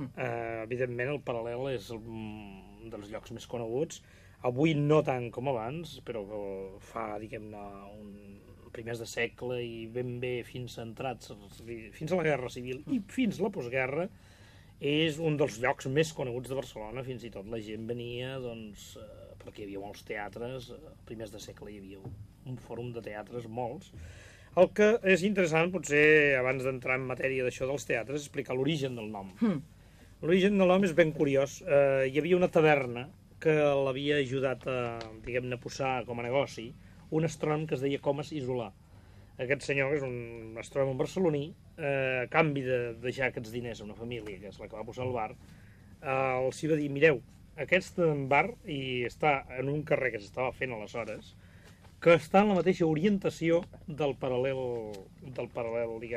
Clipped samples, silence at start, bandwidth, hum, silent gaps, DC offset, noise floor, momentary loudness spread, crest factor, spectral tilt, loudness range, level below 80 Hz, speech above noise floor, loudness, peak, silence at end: under 0.1%; 0 s; 14.5 kHz; none; none; under 0.1%; -55 dBFS; 19 LU; 22 dB; -6 dB/octave; 14 LU; -58 dBFS; 24 dB; -31 LUFS; -10 dBFS; 0 s